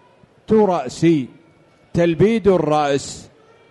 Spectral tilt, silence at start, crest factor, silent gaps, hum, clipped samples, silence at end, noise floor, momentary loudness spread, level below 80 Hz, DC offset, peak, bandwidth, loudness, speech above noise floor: -6.5 dB/octave; 0.5 s; 14 dB; none; none; under 0.1%; 0.5 s; -52 dBFS; 13 LU; -48 dBFS; under 0.1%; -4 dBFS; 11.5 kHz; -17 LUFS; 36 dB